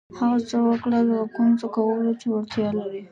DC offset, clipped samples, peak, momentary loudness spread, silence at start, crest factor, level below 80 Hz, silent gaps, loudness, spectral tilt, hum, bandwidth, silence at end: under 0.1%; under 0.1%; -10 dBFS; 5 LU; 0.1 s; 12 dB; -62 dBFS; none; -23 LUFS; -7 dB/octave; none; 7.4 kHz; 0.05 s